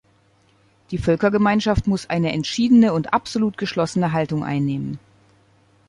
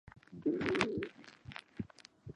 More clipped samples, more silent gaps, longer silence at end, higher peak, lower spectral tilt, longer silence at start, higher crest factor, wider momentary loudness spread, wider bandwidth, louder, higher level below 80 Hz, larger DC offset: neither; neither; first, 0.9 s vs 0.05 s; first, -4 dBFS vs -12 dBFS; about the same, -6.5 dB/octave vs -5.5 dB/octave; first, 0.9 s vs 0.3 s; second, 16 dB vs 28 dB; second, 10 LU vs 21 LU; about the same, 11 kHz vs 11 kHz; first, -20 LUFS vs -38 LUFS; first, -42 dBFS vs -64 dBFS; neither